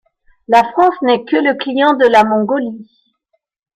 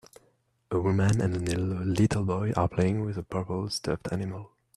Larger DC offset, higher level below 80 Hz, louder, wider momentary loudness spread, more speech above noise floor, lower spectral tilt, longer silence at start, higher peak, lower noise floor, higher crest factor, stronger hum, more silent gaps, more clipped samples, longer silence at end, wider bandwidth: neither; about the same, -56 dBFS vs -52 dBFS; first, -13 LUFS vs -28 LUFS; about the same, 9 LU vs 8 LU; first, 54 dB vs 41 dB; about the same, -5.5 dB/octave vs -6.5 dB/octave; second, 0.5 s vs 0.7 s; first, 0 dBFS vs -10 dBFS; about the same, -67 dBFS vs -68 dBFS; about the same, 14 dB vs 18 dB; neither; neither; neither; first, 0.95 s vs 0.3 s; about the same, 13 kHz vs 12.5 kHz